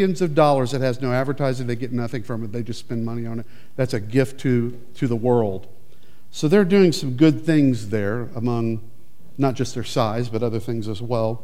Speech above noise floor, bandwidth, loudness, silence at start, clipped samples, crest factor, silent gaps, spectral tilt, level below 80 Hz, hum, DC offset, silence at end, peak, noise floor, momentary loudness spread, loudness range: 33 dB; 15.5 kHz; -22 LUFS; 0 s; under 0.1%; 18 dB; none; -7 dB/octave; -58 dBFS; none; 3%; 0.05 s; -2 dBFS; -54 dBFS; 12 LU; 6 LU